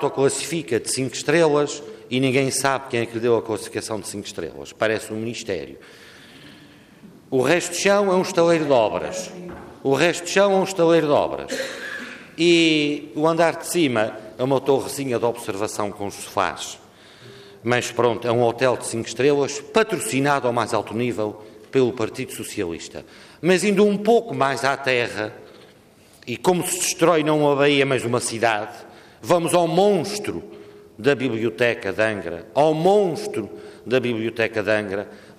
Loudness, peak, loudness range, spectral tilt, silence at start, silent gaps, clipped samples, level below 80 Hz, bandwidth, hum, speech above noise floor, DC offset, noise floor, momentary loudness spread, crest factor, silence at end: -21 LUFS; -4 dBFS; 5 LU; -4.5 dB/octave; 0 s; none; under 0.1%; -62 dBFS; 15.5 kHz; none; 30 dB; under 0.1%; -51 dBFS; 13 LU; 16 dB; 0.05 s